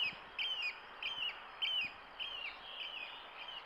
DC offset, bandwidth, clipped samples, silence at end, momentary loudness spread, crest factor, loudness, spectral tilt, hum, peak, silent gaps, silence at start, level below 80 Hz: under 0.1%; 15.5 kHz; under 0.1%; 0 s; 9 LU; 16 dB; -40 LUFS; -1 dB/octave; none; -28 dBFS; none; 0 s; -74 dBFS